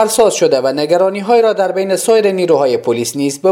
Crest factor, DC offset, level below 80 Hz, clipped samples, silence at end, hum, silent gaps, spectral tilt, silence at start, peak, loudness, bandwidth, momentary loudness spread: 12 dB; under 0.1%; -56 dBFS; under 0.1%; 0 s; none; none; -4 dB/octave; 0 s; 0 dBFS; -13 LUFS; 17 kHz; 4 LU